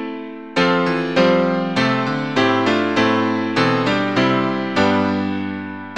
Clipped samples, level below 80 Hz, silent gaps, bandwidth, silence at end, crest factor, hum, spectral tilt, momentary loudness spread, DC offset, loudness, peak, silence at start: under 0.1%; -54 dBFS; none; 9.4 kHz; 0 s; 16 dB; none; -6 dB/octave; 8 LU; 0.4%; -18 LUFS; -2 dBFS; 0 s